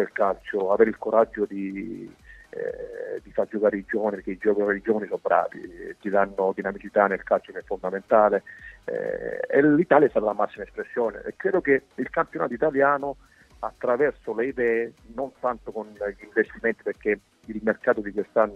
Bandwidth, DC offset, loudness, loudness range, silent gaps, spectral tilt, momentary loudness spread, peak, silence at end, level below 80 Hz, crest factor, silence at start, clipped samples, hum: 7 kHz; under 0.1%; -25 LUFS; 5 LU; none; -8 dB/octave; 14 LU; -2 dBFS; 0 s; -56 dBFS; 22 dB; 0 s; under 0.1%; none